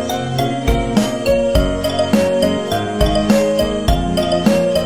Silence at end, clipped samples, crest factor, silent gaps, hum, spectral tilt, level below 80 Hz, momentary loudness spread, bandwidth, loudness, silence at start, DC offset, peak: 0 s; under 0.1%; 16 dB; none; none; -5.5 dB/octave; -24 dBFS; 4 LU; 16 kHz; -16 LUFS; 0 s; 1%; 0 dBFS